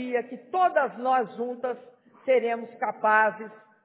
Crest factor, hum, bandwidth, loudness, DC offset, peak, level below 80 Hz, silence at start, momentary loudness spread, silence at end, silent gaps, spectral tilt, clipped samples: 18 dB; none; 4 kHz; -26 LUFS; under 0.1%; -8 dBFS; under -90 dBFS; 0 s; 14 LU; 0.3 s; none; -8 dB/octave; under 0.1%